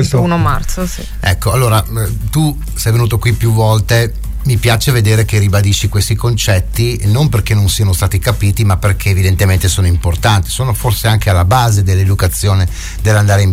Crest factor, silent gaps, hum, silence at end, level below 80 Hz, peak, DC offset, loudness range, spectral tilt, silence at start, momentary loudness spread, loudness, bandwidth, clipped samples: 10 dB; none; none; 0 s; -22 dBFS; 0 dBFS; 0.5%; 1 LU; -5 dB/octave; 0 s; 5 LU; -12 LUFS; 16.5 kHz; under 0.1%